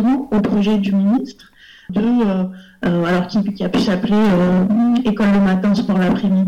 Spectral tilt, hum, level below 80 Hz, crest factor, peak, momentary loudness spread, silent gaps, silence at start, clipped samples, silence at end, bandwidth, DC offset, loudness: -8 dB/octave; none; -44 dBFS; 6 dB; -10 dBFS; 6 LU; none; 0 s; under 0.1%; 0 s; 8.2 kHz; under 0.1%; -16 LUFS